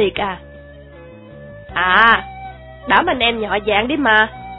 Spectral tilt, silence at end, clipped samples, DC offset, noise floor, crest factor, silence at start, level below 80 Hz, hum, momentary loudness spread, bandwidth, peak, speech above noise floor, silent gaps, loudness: -7 dB/octave; 0 s; under 0.1%; under 0.1%; -38 dBFS; 18 dB; 0 s; -42 dBFS; none; 21 LU; 5.4 kHz; 0 dBFS; 23 dB; none; -15 LUFS